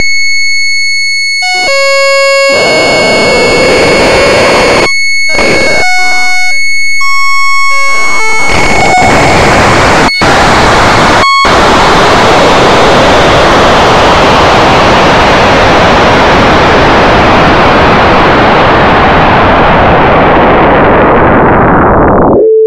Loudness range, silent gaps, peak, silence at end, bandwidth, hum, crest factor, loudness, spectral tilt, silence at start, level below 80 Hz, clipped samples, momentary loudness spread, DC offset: 2 LU; none; 0 dBFS; 0 s; 17 kHz; none; 6 dB; -4 LUFS; -4 dB/octave; 0 s; -20 dBFS; 4%; 3 LU; under 0.1%